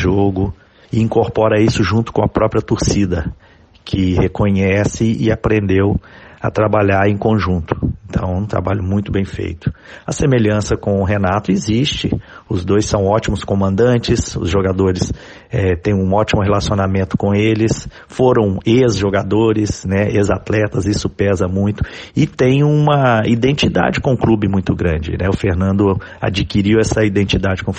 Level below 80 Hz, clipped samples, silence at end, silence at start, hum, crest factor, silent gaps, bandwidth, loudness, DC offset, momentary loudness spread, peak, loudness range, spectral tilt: -32 dBFS; under 0.1%; 0 s; 0 s; none; 14 dB; none; 9.2 kHz; -16 LUFS; under 0.1%; 8 LU; -2 dBFS; 3 LU; -6.5 dB/octave